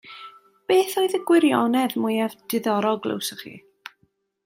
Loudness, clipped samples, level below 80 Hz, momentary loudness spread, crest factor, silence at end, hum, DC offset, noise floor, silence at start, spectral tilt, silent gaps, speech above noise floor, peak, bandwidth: -22 LUFS; under 0.1%; -74 dBFS; 23 LU; 18 dB; 0.9 s; none; under 0.1%; -67 dBFS; 0.05 s; -4.5 dB/octave; none; 46 dB; -6 dBFS; 16 kHz